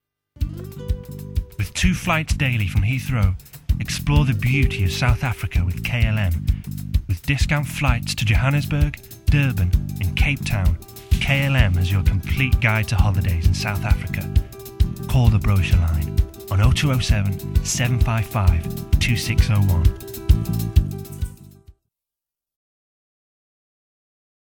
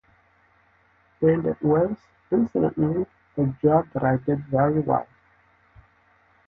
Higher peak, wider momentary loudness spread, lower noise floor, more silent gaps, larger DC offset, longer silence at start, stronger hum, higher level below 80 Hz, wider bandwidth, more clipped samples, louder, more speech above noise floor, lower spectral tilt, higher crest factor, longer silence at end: first, -2 dBFS vs -8 dBFS; first, 9 LU vs 6 LU; first, -88 dBFS vs -61 dBFS; neither; neither; second, 0.4 s vs 1.2 s; neither; first, -24 dBFS vs -54 dBFS; first, 18 kHz vs 3.7 kHz; neither; about the same, -21 LUFS vs -23 LUFS; first, 69 dB vs 39 dB; second, -5.5 dB/octave vs -12 dB/octave; about the same, 18 dB vs 18 dB; first, 2.85 s vs 1.45 s